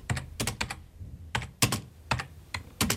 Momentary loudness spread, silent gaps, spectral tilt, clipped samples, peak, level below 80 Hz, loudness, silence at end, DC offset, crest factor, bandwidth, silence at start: 13 LU; none; -3 dB/octave; under 0.1%; -8 dBFS; -46 dBFS; -32 LUFS; 0 s; under 0.1%; 26 dB; 16.5 kHz; 0 s